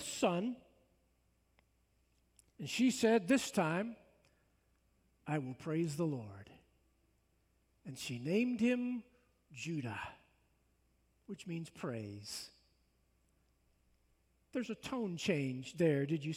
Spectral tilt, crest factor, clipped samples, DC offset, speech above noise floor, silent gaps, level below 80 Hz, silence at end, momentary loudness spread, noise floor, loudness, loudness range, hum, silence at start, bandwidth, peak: -5.5 dB/octave; 20 dB; under 0.1%; under 0.1%; 39 dB; none; -76 dBFS; 0 s; 19 LU; -76 dBFS; -37 LUFS; 12 LU; none; 0 s; 16 kHz; -20 dBFS